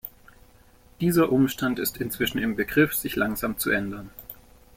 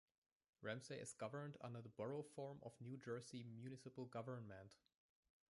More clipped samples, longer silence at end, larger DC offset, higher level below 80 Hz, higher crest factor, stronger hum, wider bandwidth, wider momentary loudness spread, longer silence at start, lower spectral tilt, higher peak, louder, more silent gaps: neither; second, 0.4 s vs 0.75 s; neither; first, -50 dBFS vs -86 dBFS; about the same, 20 dB vs 20 dB; neither; first, 16.5 kHz vs 11.5 kHz; first, 18 LU vs 5 LU; second, 0.05 s vs 0.6 s; about the same, -5 dB/octave vs -5.5 dB/octave; first, -6 dBFS vs -36 dBFS; first, -25 LUFS vs -54 LUFS; neither